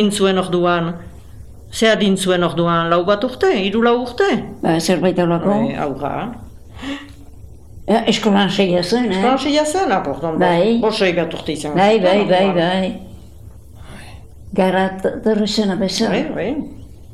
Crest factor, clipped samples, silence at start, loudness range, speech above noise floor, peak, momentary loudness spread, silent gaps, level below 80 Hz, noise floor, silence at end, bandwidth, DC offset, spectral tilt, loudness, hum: 16 dB; under 0.1%; 0 s; 4 LU; 23 dB; 0 dBFS; 13 LU; none; -42 dBFS; -39 dBFS; 0.1 s; 14 kHz; 0.8%; -5.5 dB/octave; -17 LUFS; none